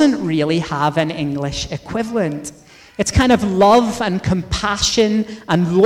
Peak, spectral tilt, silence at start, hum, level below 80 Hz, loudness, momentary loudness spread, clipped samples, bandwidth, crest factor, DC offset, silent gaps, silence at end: -4 dBFS; -5 dB/octave; 0 s; none; -36 dBFS; -17 LUFS; 11 LU; under 0.1%; 15.5 kHz; 14 dB; under 0.1%; none; 0 s